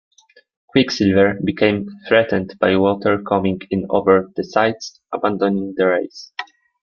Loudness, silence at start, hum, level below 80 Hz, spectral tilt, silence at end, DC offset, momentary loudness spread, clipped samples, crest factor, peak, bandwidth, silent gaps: -18 LUFS; 0.75 s; none; -56 dBFS; -6 dB/octave; 0.4 s; under 0.1%; 13 LU; under 0.1%; 16 dB; -2 dBFS; 7 kHz; none